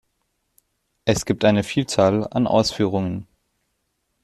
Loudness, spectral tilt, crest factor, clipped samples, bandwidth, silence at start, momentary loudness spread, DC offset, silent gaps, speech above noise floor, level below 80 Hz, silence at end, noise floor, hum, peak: -20 LUFS; -5.5 dB/octave; 20 dB; under 0.1%; 13.5 kHz; 1.05 s; 8 LU; under 0.1%; none; 53 dB; -50 dBFS; 1 s; -73 dBFS; none; -2 dBFS